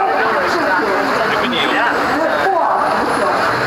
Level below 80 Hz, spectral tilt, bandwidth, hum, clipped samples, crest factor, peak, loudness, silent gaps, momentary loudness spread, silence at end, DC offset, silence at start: -48 dBFS; -4 dB/octave; 16 kHz; none; under 0.1%; 12 dB; -4 dBFS; -15 LUFS; none; 1 LU; 0 s; under 0.1%; 0 s